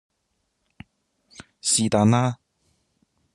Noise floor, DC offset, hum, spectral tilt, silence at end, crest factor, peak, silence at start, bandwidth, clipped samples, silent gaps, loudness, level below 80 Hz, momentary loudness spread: -74 dBFS; under 0.1%; none; -4.5 dB/octave; 1 s; 22 dB; -4 dBFS; 1.4 s; 12.5 kHz; under 0.1%; none; -21 LUFS; -62 dBFS; 10 LU